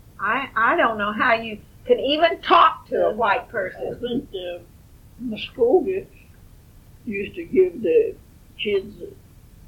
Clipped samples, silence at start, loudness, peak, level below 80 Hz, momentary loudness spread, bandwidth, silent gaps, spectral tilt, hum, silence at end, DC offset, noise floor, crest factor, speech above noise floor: under 0.1%; 0.2 s; -21 LUFS; -4 dBFS; -50 dBFS; 16 LU; 16.5 kHz; none; -6 dB/octave; none; 0.55 s; under 0.1%; -48 dBFS; 18 dB; 26 dB